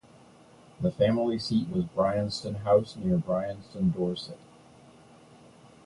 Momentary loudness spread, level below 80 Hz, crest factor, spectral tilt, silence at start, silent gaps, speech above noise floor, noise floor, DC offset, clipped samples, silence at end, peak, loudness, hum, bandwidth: 9 LU; -56 dBFS; 18 dB; -7.5 dB/octave; 0.8 s; none; 27 dB; -55 dBFS; under 0.1%; under 0.1%; 1.5 s; -10 dBFS; -28 LUFS; none; 11.5 kHz